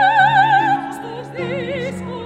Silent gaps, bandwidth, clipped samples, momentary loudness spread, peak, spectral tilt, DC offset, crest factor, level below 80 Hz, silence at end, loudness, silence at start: none; 11.5 kHz; under 0.1%; 16 LU; -2 dBFS; -5.5 dB/octave; under 0.1%; 16 dB; -56 dBFS; 0 s; -17 LUFS; 0 s